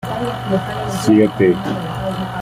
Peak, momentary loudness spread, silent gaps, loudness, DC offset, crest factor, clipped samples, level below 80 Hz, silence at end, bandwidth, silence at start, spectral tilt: -2 dBFS; 9 LU; none; -17 LUFS; under 0.1%; 16 dB; under 0.1%; -42 dBFS; 0 s; 16 kHz; 0 s; -6.5 dB/octave